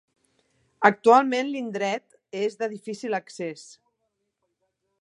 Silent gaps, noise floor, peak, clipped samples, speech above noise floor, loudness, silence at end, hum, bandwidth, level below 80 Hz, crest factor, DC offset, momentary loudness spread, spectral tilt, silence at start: none; -78 dBFS; -2 dBFS; under 0.1%; 54 dB; -24 LUFS; 1.4 s; none; 11 kHz; -80 dBFS; 26 dB; under 0.1%; 17 LU; -4.5 dB/octave; 0.8 s